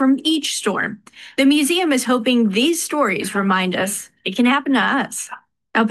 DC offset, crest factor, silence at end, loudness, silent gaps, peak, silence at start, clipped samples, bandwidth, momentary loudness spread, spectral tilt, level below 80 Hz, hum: under 0.1%; 14 dB; 0 s; -18 LUFS; none; -4 dBFS; 0 s; under 0.1%; 12.5 kHz; 10 LU; -3.5 dB/octave; -66 dBFS; none